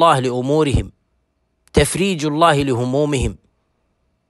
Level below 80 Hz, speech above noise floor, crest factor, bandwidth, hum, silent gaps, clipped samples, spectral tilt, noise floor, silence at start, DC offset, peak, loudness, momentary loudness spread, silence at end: -34 dBFS; 50 dB; 18 dB; 12.5 kHz; none; none; under 0.1%; -5.5 dB/octave; -67 dBFS; 0 s; under 0.1%; -2 dBFS; -17 LUFS; 8 LU; 0.95 s